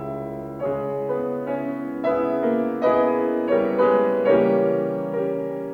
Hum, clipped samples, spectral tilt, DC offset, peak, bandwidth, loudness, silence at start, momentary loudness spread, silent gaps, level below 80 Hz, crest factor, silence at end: none; under 0.1%; -9 dB/octave; under 0.1%; -6 dBFS; 5 kHz; -22 LUFS; 0 s; 9 LU; none; -58 dBFS; 14 dB; 0 s